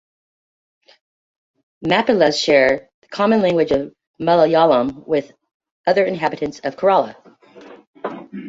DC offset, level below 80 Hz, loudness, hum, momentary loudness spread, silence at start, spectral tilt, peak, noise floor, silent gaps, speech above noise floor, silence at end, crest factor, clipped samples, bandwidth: under 0.1%; -54 dBFS; -17 LUFS; none; 15 LU; 1.8 s; -5 dB/octave; 0 dBFS; -43 dBFS; 2.94-3.02 s, 4.07-4.14 s, 5.54-5.60 s, 5.71-5.84 s, 7.87-7.94 s; 26 dB; 0 s; 18 dB; under 0.1%; 7.8 kHz